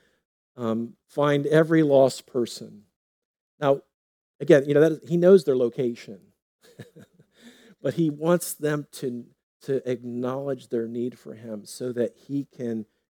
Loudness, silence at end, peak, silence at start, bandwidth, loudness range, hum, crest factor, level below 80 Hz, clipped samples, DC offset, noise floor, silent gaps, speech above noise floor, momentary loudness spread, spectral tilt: -24 LUFS; 0.35 s; -2 dBFS; 0.6 s; 20 kHz; 8 LU; none; 22 dB; -82 dBFS; under 0.1%; under 0.1%; -53 dBFS; 2.96-3.34 s, 3.41-3.58 s, 3.94-4.39 s, 6.42-6.59 s, 9.43-9.60 s; 30 dB; 17 LU; -6.5 dB/octave